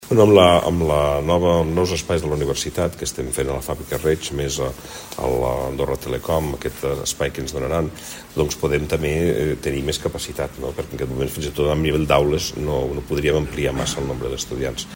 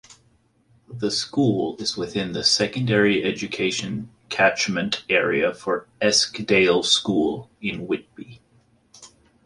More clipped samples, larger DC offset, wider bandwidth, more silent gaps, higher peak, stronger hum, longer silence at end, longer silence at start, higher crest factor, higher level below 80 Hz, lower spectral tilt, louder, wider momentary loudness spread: neither; neither; first, 16.5 kHz vs 11.5 kHz; neither; first, 0 dBFS vs -4 dBFS; neither; second, 0 s vs 0.4 s; about the same, 0 s vs 0.1 s; about the same, 20 dB vs 20 dB; first, -34 dBFS vs -56 dBFS; first, -5 dB/octave vs -3.5 dB/octave; about the same, -21 LUFS vs -21 LUFS; about the same, 9 LU vs 11 LU